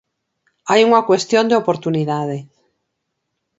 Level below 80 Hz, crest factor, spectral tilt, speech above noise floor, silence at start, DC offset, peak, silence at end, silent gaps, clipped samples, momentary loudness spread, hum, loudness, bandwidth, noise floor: -66 dBFS; 18 dB; -5 dB/octave; 59 dB; 0.65 s; under 0.1%; 0 dBFS; 1.15 s; none; under 0.1%; 13 LU; none; -16 LUFS; 8 kHz; -75 dBFS